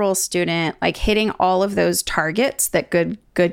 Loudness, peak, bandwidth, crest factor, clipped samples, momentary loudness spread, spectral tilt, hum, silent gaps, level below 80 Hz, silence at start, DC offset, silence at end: -19 LUFS; -4 dBFS; 17 kHz; 16 dB; under 0.1%; 3 LU; -3.5 dB/octave; none; none; -38 dBFS; 0 s; under 0.1%; 0 s